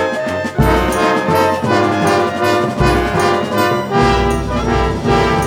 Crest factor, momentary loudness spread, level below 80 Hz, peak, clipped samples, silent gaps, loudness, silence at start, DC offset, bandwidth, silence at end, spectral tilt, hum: 14 dB; 3 LU; -26 dBFS; 0 dBFS; under 0.1%; none; -14 LUFS; 0 s; under 0.1%; over 20 kHz; 0 s; -5.5 dB/octave; none